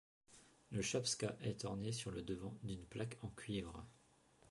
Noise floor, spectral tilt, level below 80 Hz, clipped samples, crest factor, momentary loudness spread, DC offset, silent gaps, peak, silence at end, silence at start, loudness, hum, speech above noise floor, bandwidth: -71 dBFS; -4.5 dB/octave; -66 dBFS; under 0.1%; 18 dB; 15 LU; under 0.1%; none; -28 dBFS; 0 s; 0.3 s; -45 LUFS; none; 27 dB; 11.5 kHz